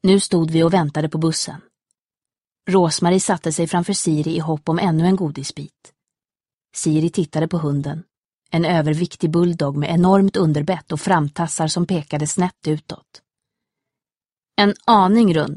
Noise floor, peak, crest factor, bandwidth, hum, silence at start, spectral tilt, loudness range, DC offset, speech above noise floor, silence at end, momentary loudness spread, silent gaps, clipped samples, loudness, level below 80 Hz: under -90 dBFS; -2 dBFS; 18 dB; 11.5 kHz; none; 0.05 s; -5.5 dB/octave; 5 LU; under 0.1%; over 72 dB; 0 s; 11 LU; 2.04-2.09 s, 6.54-6.61 s, 8.17-8.38 s; under 0.1%; -19 LUFS; -54 dBFS